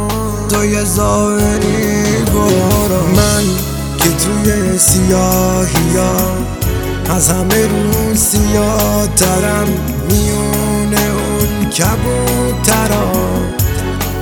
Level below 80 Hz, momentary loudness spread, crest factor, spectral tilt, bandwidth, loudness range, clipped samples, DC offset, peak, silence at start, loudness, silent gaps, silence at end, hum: -22 dBFS; 5 LU; 12 dB; -4.5 dB/octave; over 20 kHz; 2 LU; under 0.1%; under 0.1%; 0 dBFS; 0 s; -13 LUFS; none; 0 s; none